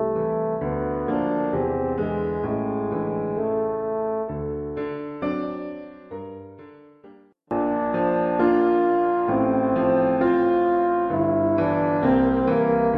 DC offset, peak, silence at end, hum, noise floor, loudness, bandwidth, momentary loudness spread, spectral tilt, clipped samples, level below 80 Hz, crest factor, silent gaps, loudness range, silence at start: under 0.1%; -8 dBFS; 0 s; none; -50 dBFS; -23 LUFS; 5 kHz; 10 LU; -10.5 dB/octave; under 0.1%; -46 dBFS; 16 dB; none; 10 LU; 0 s